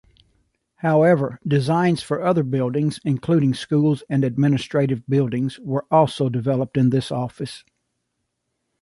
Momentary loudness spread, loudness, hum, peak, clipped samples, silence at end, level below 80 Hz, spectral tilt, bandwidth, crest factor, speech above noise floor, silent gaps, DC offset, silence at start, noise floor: 9 LU; -20 LUFS; none; -4 dBFS; under 0.1%; 1.25 s; -58 dBFS; -7.5 dB/octave; 11.5 kHz; 18 dB; 56 dB; none; under 0.1%; 0.85 s; -76 dBFS